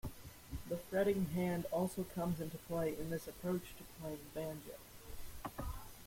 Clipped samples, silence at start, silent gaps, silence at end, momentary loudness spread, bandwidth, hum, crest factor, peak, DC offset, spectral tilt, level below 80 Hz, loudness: under 0.1%; 0.05 s; none; 0 s; 17 LU; 16.5 kHz; none; 18 dB; -22 dBFS; under 0.1%; -6.5 dB/octave; -56 dBFS; -41 LUFS